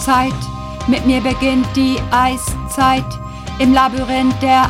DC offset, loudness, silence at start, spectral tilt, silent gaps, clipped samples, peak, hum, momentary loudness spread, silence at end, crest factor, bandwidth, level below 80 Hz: under 0.1%; -15 LUFS; 0 s; -5 dB/octave; none; under 0.1%; -2 dBFS; none; 11 LU; 0 s; 14 dB; 16 kHz; -30 dBFS